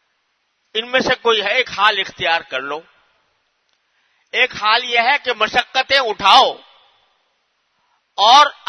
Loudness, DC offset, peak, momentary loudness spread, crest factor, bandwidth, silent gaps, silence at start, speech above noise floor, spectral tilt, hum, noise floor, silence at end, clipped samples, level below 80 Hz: -15 LUFS; under 0.1%; 0 dBFS; 14 LU; 18 dB; 12 kHz; none; 0.75 s; 52 dB; -1.5 dB/octave; none; -67 dBFS; 0.15 s; under 0.1%; -58 dBFS